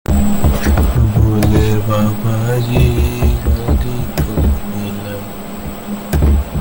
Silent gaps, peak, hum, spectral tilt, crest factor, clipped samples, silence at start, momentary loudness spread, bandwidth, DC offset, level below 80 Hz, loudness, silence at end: none; 0 dBFS; none; -7 dB/octave; 12 dB; under 0.1%; 0.1 s; 12 LU; 17 kHz; under 0.1%; -18 dBFS; -15 LUFS; 0 s